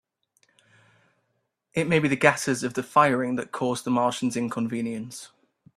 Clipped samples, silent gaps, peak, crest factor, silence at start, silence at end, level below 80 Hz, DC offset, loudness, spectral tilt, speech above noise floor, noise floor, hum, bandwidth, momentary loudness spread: under 0.1%; none; -2 dBFS; 26 dB; 1.75 s; 0.5 s; -64 dBFS; under 0.1%; -24 LUFS; -5 dB/octave; 51 dB; -76 dBFS; none; 14 kHz; 11 LU